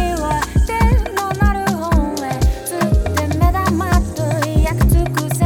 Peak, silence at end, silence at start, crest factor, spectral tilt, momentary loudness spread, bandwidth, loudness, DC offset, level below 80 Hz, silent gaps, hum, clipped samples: -2 dBFS; 0 s; 0 s; 14 dB; -6 dB/octave; 4 LU; 17.5 kHz; -17 LUFS; under 0.1%; -20 dBFS; none; none; under 0.1%